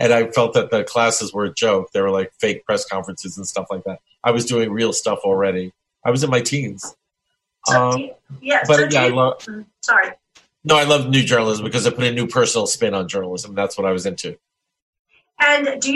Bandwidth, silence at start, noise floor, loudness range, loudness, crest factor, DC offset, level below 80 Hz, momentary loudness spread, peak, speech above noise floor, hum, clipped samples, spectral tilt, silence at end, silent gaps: 12.5 kHz; 0 s; -75 dBFS; 4 LU; -18 LUFS; 18 dB; under 0.1%; -62 dBFS; 14 LU; -2 dBFS; 57 dB; none; under 0.1%; -3.5 dB/octave; 0 s; 14.82-14.93 s, 14.99-15.05 s